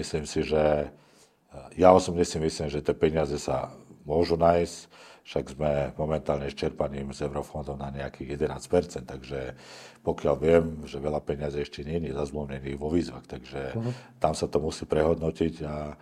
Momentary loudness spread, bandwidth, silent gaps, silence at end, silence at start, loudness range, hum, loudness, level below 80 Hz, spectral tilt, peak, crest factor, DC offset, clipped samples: 14 LU; 14 kHz; none; 0.05 s; 0 s; 7 LU; none; -28 LUFS; -48 dBFS; -6 dB/octave; -4 dBFS; 24 dB; under 0.1%; under 0.1%